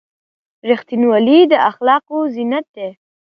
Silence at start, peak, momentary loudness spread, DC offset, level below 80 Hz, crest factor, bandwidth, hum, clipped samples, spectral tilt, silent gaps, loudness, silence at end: 0.65 s; 0 dBFS; 18 LU; under 0.1%; -70 dBFS; 14 dB; 5.6 kHz; none; under 0.1%; -7.5 dB/octave; 2.68-2.74 s; -14 LUFS; 0.3 s